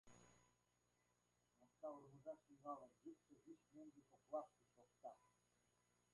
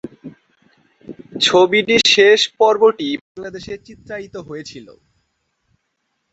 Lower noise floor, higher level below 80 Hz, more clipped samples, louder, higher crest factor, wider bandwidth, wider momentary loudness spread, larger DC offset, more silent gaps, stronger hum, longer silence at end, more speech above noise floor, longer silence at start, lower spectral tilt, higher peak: first, -86 dBFS vs -71 dBFS; second, under -90 dBFS vs -58 dBFS; neither; second, -59 LUFS vs -13 LUFS; first, 24 dB vs 18 dB; first, 11 kHz vs 8.2 kHz; second, 13 LU vs 22 LU; neither; second, none vs 3.21-3.35 s; first, 60 Hz at -90 dBFS vs none; second, 0.85 s vs 1.5 s; second, 27 dB vs 55 dB; about the same, 0.05 s vs 0.05 s; first, -6.5 dB/octave vs -2.5 dB/octave; second, -38 dBFS vs 0 dBFS